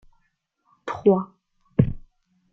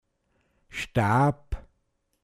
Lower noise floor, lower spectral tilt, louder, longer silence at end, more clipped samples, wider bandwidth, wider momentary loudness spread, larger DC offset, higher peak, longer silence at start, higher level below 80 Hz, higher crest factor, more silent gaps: about the same, -71 dBFS vs -74 dBFS; first, -10 dB/octave vs -7 dB/octave; about the same, -23 LUFS vs -25 LUFS; about the same, 0.55 s vs 0.65 s; neither; second, 6.8 kHz vs 14.5 kHz; about the same, 19 LU vs 18 LU; neither; first, -2 dBFS vs -12 dBFS; about the same, 0.85 s vs 0.75 s; about the same, -46 dBFS vs -42 dBFS; first, 24 dB vs 18 dB; neither